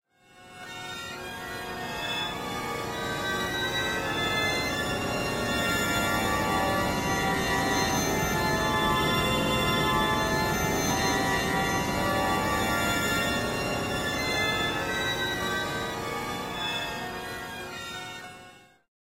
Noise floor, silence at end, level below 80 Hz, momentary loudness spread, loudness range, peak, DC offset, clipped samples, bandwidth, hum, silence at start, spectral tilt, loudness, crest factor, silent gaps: -53 dBFS; 0.6 s; -46 dBFS; 11 LU; 6 LU; -12 dBFS; under 0.1%; under 0.1%; 16 kHz; none; 0.35 s; -3.5 dB/octave; -27 LUFS; 16 dB; none